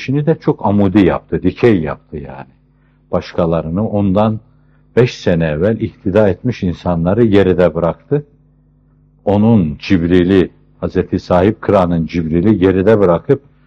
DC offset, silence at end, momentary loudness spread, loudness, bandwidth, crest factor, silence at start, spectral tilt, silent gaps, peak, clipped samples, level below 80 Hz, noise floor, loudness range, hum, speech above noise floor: under 0.1%; 0.3 s; 9 LU; -14 LUFS; 7.2 kHz; 14 dB; 0 s; -8.5 dB/octave; none; 0 dBFS; under 0.1%; -40 dBFS; -52 dBFS; 4 LU; none; 39 dB